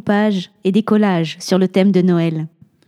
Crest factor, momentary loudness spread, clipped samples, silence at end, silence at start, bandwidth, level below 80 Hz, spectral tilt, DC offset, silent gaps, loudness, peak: 16 dB; 7 LU; under 0.1%; 0.4 s; 0.05 s; 12.5 kHz; -66 dBFS; -7 dB/octave; under 0.1%; none; -16 LUFS; 0 dBFS